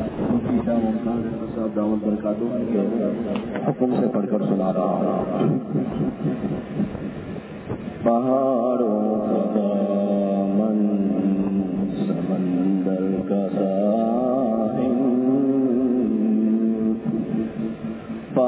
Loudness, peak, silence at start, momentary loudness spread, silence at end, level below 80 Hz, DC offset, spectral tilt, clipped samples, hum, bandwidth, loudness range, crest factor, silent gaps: -22 LUFS; -6 dBFS; 0 s; 7 LU; 0 s; -50 dBFS; under 0.1%; -12.5 dB/octave; under 0.1%; none; 4 kHz; 3 LU; 16 dB; none